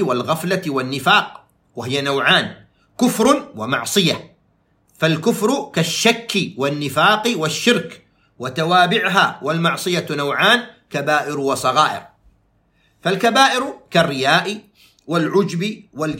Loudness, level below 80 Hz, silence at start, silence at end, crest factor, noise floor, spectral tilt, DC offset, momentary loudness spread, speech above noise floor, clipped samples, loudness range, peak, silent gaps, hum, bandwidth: -17 LUFS; -60 dBFS; 0 s; 0 s; 18 dB; -61 dBFS; -4 dB/octave; under 0.1%; 11 LU; 43 dB; under 0.1%; 2 LU; 0 dBFS; none; none; 16.5 kHz